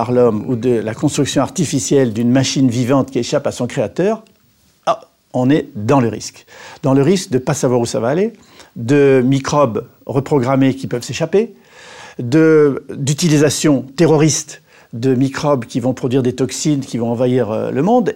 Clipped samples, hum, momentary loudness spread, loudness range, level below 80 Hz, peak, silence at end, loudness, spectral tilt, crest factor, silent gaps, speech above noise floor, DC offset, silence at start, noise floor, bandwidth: under 0.1%; none; 9 LU; 4 LU; -52 dBFS; -2 dBFS; 0 s; -16 LUFS; -5.5 dB/octave; 12 dB; none; 40 dB; under 0.1%; 0 s; -55 dBFS; 16.5 kHz